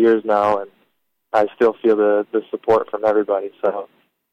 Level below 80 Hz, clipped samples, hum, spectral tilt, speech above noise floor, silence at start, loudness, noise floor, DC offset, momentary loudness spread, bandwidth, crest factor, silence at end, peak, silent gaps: -60 dBFS; under 0.1%; none; -7 dB/octave; 50 dB; 0 s; -19 LUFS; -68 dBFS; under 0.1%; 8 LU; 7.2 kHz; 14 dB; 0.45 s; -4 dBFS; none